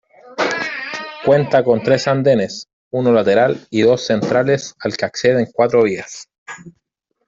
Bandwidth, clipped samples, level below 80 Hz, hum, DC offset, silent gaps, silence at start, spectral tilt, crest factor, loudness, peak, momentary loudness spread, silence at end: 7.8 kHz; under 0.1%; -56 dBFS; none; under 0.1%; 2.73-2.91 s, 6.38-6.46 s; 0.25 s; -5.5 dB/octave; 16 dB; -16 LUFS; -2 dBFS; 18 LU; 0.55 s